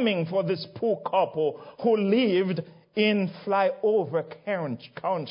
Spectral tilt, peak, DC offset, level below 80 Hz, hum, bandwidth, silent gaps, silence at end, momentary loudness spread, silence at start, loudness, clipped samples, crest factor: -10.5 dB/octave; -10 dBFS; under 0.1%; -74 dBFS; none; 5.4 kHz; none; 0 s; 8 LU; 0 s; -26 LUFS; under 0.1%; 16 dB